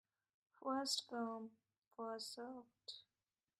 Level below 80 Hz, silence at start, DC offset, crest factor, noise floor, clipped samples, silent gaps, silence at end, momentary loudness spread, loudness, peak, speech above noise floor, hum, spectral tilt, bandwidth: under -90 dBFS; 0.6 s; under 0.1%; 20 dB; under -90 dBFS; under 0.1%; 1.78-1.82 s; 0.6 s; 16 LU; -46 LUFS; -28 dBFS; over 43 dB; none; -2 dB/octave; 15.5 kHz